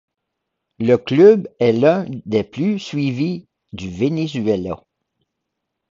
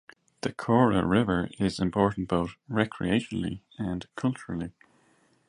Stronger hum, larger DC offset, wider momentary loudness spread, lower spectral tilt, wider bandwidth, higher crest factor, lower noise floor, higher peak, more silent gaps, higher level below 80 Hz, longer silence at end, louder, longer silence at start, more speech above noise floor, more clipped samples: neither; neither; first, 19 LU vs 13 LU; about the same, -7.5 dB/octave vs -7 dB/octave; second, 7.4 kHz vs 11.5 kHz; about the same, 18 dB vs 22 dB; first, -78 dBFS vs -65 dBFS; first, 0 dBFS vs -6 dBFS; neither; about the same, -52 dBFS vs -50 dBFS; first, 1.15 s vs 0.8 s; first, -17 LUFS vs -28 LUFS; first, 0.8 s vs 0.45 s; first, 61 dB vs 38 dB; neither